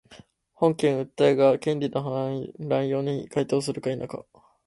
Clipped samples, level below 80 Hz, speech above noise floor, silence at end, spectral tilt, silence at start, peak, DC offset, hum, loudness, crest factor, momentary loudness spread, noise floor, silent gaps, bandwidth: under 0.1%; -64 dBFS; 28 dB; 0.45 s; -6.5 dB/octave; 0.1 s; -6 dBFS; under 0.1%; none; -25 LUFS; 18 dB; 11 LU; -52 dBFS; none; 11.5 kHz